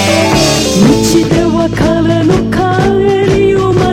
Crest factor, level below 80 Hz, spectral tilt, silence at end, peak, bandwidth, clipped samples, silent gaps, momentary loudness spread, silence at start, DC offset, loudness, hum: 8 dB; -26 dBFS; -5 dB/octave; 0 s; 0 dBFS; 16.5 kHz; under 0.1%; none; 3 LU; 0 s; under 0.1%; -9 LUFS; none